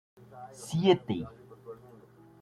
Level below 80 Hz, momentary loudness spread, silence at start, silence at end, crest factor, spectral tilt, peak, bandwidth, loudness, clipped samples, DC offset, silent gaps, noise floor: -66 dBFS; 24 LU; 0.3 s; 0.65 s; 22 dB; -6.5 dB/octave; -10 dBFS; 12.5 kHz; -29 LUFS; under 0.1%; under 0.1%; none; -55 dBFS